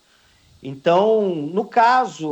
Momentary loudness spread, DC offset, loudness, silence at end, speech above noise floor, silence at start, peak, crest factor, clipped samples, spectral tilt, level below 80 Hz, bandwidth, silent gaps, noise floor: 13 LU; under 0.1%; -18 LUFS; 0 s; 38 dB; 0.65 s; -6 dBFS; 14 dB; under 0.1%; -6 dB/octave; -66 dBFS; 8.4 kHz; none; -56 dBFS